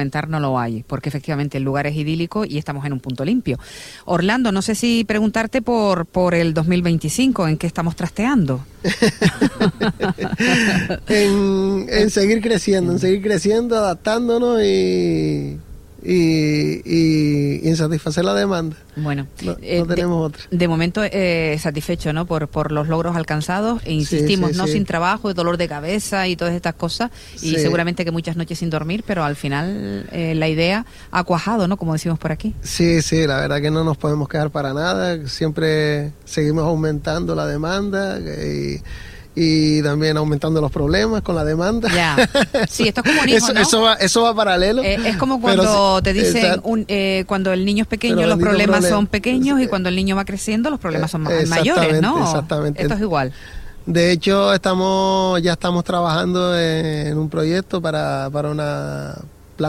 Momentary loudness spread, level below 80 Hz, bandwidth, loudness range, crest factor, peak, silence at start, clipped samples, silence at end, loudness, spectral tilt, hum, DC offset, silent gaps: 9 LU; -38 dBFS; 16 kHz; 6 LU; 18 dB; 0 dBFS; 0 s; under 0.1%; 0 s; -18 LUFS; -5.5 dB/octave; none; under 0.1%; none